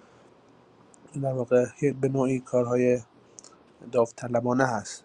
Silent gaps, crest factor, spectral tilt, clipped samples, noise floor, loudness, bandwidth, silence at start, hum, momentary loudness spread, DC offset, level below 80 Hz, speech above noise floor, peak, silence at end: none; 20 dB; -7 dB/octave; under 0.1%; -57 dBFS; -26 LUFS; 10.5 kHz; 1.15 s; none; 6 LU; under 0.1%; -66 dBFS; 31 dB; -8 dBFS; 0.05 s